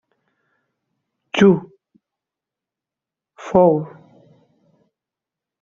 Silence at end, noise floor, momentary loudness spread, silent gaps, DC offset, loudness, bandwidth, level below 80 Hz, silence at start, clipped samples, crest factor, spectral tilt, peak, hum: 1.75 s; -87 dBFS; 19 LU; none; under 0.1%; -17 LUFS; 7.4 kHz; -58 dBFS; 1.35 s; under 0.1%; 20 dB; -6 dB/octave; -2 dBFS; none